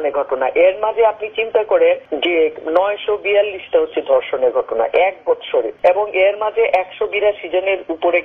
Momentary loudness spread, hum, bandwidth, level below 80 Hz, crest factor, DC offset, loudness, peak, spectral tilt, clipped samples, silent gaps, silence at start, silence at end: 5 LU; none; 4.3 kHz; -56 dBFS; 14 dB; under 0.1%; -17 LUFS; -2 dBFS; -5.5 dB/octave; under 0.1%; none; 0 s; 0 s